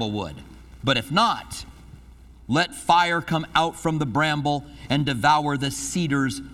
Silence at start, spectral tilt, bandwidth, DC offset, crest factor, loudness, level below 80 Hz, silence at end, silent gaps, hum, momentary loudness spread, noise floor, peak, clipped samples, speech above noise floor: 0 s; -4.5 dB/octave; 15.5 kHz; under 0.1%; 20 dB; -23 LUFS; -48 dBFS; 0 s; none; none; 11 LU; -47 dBFS; -4 dBFS; under 0.1%; 24 dB